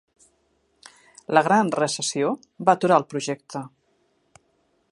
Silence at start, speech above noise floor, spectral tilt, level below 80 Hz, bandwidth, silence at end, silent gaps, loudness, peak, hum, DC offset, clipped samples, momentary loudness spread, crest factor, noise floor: 1.3 s; 46 dB; -4 dB/octave; -74 dBFS; 11.5 kHz; 1.25 s; none; -22 LUFS; -2 dBFS; none; under 0.1%; under 0.1%; 17 LU; 22 dB; -67 dBFS